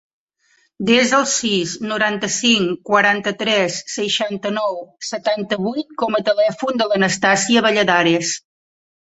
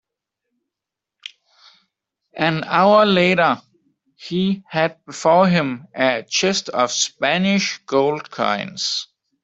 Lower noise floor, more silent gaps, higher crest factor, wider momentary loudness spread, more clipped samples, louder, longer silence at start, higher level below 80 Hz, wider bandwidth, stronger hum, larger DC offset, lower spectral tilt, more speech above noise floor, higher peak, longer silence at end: second, -61 dBFS vs -85 dBFS; neither; about the same, 18 dB vs 18 dB; second, 9 LU vs 13 LU; neither; about the same, -17 LUFS vs -18 LUFS; second, 0.8 s vs 2.35 s; about the same, -62 dBFS vs -62 dBFS; about the same, 8.2 kHz vs 8 kHz; neither; neither; about the same, -3 dB/octave vs -4 dB/octave; second, 43 dB vs 67 dB; about the same, -2 dBFS vs -2 dBFS; first, 0.8 s vs 0.4 s